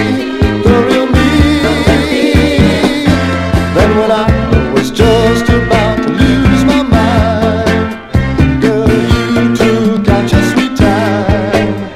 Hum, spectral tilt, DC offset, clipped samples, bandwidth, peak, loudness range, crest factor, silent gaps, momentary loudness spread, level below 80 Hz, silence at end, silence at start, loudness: none; -6.5 dB/octave; under 0.1%; 2%; 15 kHz; 0 dBFS; 1 LU; 10 dB; none; 4 LU; -20 dBFS; 0 s; 0 s; -10 LUFS